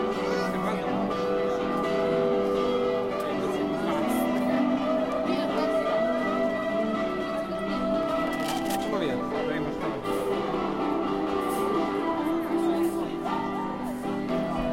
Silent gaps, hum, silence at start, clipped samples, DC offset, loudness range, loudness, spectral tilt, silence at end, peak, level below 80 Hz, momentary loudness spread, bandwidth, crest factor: none; none; 0 s; under 0.1%; under 0.1%; 2 LU; -27 LUFS; -6 dB/octave; 0 s; -14 dBFS; -52 dBFS; 4 LU; 16.5 kHz; 14 dB